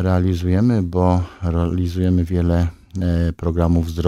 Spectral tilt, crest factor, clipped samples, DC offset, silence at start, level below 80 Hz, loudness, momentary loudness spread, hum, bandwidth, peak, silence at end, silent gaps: -9 dB/octave; 16 dB; under 0.1%; 0.2%; 0 s; -30 dBFS; -19 LUFS; 4 LU; none; 7.2 kHz; -2 dBFS; 0 s; none